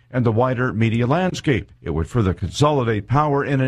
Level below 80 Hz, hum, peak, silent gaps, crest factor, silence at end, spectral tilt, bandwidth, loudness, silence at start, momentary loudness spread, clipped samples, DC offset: -40 dBFS; none; -4 dBFS; none; 16 dB; 0 s; -7 dB/octave; 11 kHz; -20 LUFS; 0.1 s; 5 LU; under 0.1%; under 0.1%